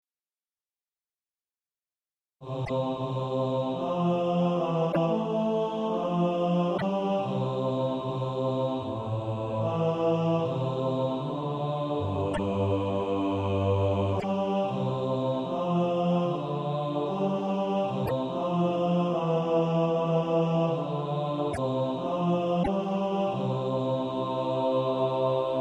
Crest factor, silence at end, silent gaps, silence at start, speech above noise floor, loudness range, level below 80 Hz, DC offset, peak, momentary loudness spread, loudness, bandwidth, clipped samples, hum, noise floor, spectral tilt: 14 dB; 0 s; none; 2.4 s; over 61 dB; 3 LU; -58 dBFS; under 0.1%; -14 dBFS; 4 LU; -28 LUFS; 10 kHz; under 0.1%; none; under -90 dBFS; -8.5 dB/octave